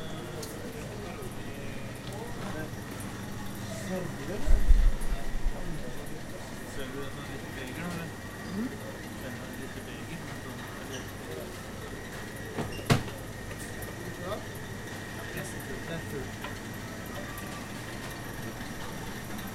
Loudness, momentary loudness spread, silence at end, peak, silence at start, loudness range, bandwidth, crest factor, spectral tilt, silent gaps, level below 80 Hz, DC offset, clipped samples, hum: -37 LUFS; 8 LU; 0 s; -6 dBFS; 0 s; 5 LU; 16 kHz; 26 dB; -5 dB/octave; none; -36 dBFS; under 0.1%; under 0.1%; none